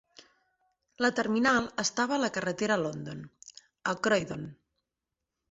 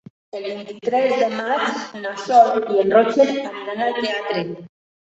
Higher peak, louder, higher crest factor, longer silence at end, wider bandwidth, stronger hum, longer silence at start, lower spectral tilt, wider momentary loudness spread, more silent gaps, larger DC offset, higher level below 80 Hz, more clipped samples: second, -12 dBFS vs -2 dBFS; second, -29 LUFS vs -19 LUFS; about the same, 20 dB vs 18 dB; first, 0.95 s vs 0.45 s; about the same, 8 kHz vs 8 kHz; neither; first, 1 s vs 0.35 s; about the same, -4 dB/octave vs -4.5 dB/octave; first, 19 LU vs 15 LU; neither; neither; about the same, -66 dBFS vs -68 dBFS; neither